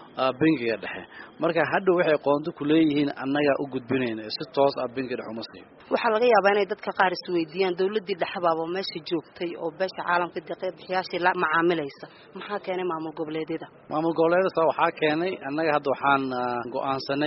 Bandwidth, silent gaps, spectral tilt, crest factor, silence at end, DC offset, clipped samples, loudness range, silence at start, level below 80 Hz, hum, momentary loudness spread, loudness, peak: 6 kHz; none; -3.5 dB/octave; 20 dB; 0 s; under 0.1%; under 0.1%; 3 LU; 0 s; -68 dBFS; none; 11 LU; -25 LUFS; -6 dBFS